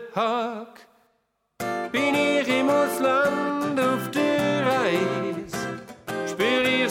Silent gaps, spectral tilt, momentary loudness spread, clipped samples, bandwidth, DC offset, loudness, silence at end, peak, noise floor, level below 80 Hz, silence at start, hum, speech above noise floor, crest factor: none; -4.5 dB/octave; 11 LU; under 0.1%; 17.5 kHz; under 0.1%; -24 LUFS; 0 s; -8 dBFS; -72 dBFS; -64 dBFS; 0 s; none; 47 dB; 16 dB